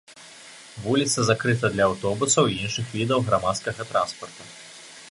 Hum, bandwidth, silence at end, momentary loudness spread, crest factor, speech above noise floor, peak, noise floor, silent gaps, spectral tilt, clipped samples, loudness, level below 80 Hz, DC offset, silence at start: none; 11.5 kHz; 0 s; 21 LU; 20 dB; 22 dB; -4 dBFS; -46 dBFS; none; -4 dB/octave; under 0.1%; -23 LUFS; -54 dBFS; under 0.1%; 0.1 s